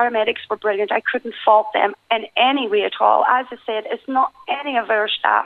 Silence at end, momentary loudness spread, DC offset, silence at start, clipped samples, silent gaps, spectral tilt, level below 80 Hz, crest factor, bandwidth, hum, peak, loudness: 0 s; 8 LU; under 0.1%; 0 s; under 0.1%; none; -5 dB/octave; -68 dBFS; 16 dB; 4.7 kHz; none; -2 dBFS; -19 LUFS